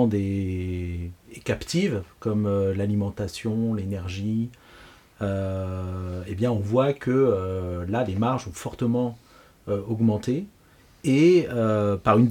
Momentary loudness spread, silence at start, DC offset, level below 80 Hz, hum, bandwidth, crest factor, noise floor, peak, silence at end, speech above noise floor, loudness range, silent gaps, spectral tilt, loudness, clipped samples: 11 LU; 0 s; under 0.1%; -50 dBFS; none; 15.5 kHz; 18 dB; -55 dBFS; -6 dBFS; 0 s; 31 dB; 5 LU; none; -7.5 dB/octave; -25 LUFS; under 0.1%